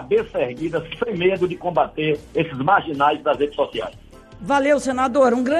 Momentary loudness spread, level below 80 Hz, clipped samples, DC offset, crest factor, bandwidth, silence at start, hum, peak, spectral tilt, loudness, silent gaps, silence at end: 9 LU; -48 dBFS; under 0.1%; under 0.1%; 16 dB; 12 kHz; 0 s; none; -4 dBFS; -5.5 dB/octave; -20 LUFS; none; 0 s